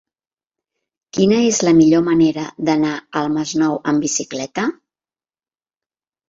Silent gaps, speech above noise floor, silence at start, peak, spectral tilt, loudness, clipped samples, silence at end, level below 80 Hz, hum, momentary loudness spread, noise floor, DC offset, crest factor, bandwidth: none; over 74 dB; 1.15 s; -2 dBFS; -4.5 dB/octave; -17 LUFS; under 0.1%; 1.55 s; -56 dBFS; none; 10 LU; under -90 dBFS; under 0.1%; 16 dB; 7.8 kHz